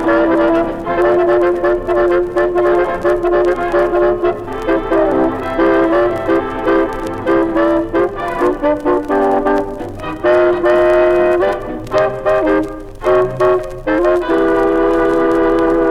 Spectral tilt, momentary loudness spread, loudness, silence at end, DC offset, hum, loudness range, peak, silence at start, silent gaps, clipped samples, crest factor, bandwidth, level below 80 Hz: -7 dB/octave; 6 LU; -14 LUFS; 0 s; 0.1%; none; 2 LU; -2 dBFS; 0 s; none; under 0.1%; 10 dB; 10.5 kHz; -34 dBFS